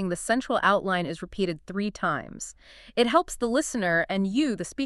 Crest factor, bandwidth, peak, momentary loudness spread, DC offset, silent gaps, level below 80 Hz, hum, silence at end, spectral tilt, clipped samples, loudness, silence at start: 20 dB; 13.5 kHz; -6 dBFS; 10 LU; under 0.1%; none; -52 dBFS; none; 0 s; -4.5 dB/octave; under 0.1%; -26 LUFS; 0 s